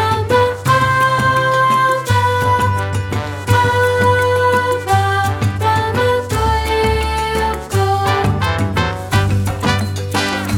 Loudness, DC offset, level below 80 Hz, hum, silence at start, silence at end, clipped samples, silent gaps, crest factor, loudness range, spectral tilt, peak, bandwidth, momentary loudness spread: -15 LUFS; under 0.1%; -30 dBFS; none; 0 s; 0 s; under 0.1%; none; 14 dB; 2 LU; -5 dB/octave; -2 dBFS; 17.5 kHz; 5 LU